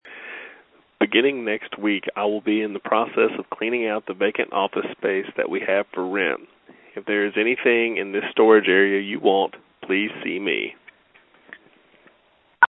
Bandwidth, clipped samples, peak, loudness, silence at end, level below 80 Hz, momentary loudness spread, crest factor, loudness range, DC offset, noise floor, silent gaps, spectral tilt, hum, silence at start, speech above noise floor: 4 kHz; under 0.1%; 0 dBFS; -22 LUFS; 0 s; -72 dBFS; 10 LU; 22 dB; 5 LU; under 0.1%; -60 dBFS; none; -9 dB/octave; none; 0.05 s; 38 dB